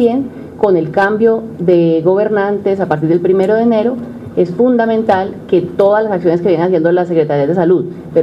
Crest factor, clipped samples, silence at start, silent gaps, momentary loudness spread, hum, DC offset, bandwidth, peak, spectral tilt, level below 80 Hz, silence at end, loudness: 12 dB; under 0.1%; 0 s; none; 5 LU; none; under 0.1%; 7.4 kHz; 0 dBFS; -9 dB/octave; -52 dBFS; 0 s; -13 LUFS